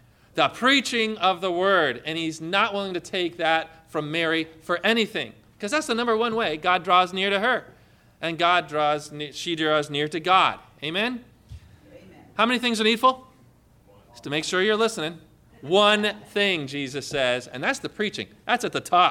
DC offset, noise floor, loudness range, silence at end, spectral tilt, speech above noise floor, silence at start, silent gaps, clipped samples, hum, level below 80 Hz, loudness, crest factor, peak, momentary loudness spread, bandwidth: under 0.1%; -56 dBFS; 2 LU; 0 s; -3.5 dB/octave; 32 dB; 0.35 s; none; under 0.1%; none; -62 dBFS; -23 LUFS; 18 dB; -6 dBFS; 12 LU; 17 kHz